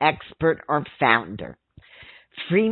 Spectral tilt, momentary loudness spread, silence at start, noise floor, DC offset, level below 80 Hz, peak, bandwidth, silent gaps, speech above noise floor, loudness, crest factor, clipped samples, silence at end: -10.5 dB/octave; 18 LU; 0 s; -48 dBFS; under 0.1%; -56 dBFS; -2 dBFS; 4.4 kHz; none; 26 dB; -22 LUFS; 22 dB; under 0.1%; 0 s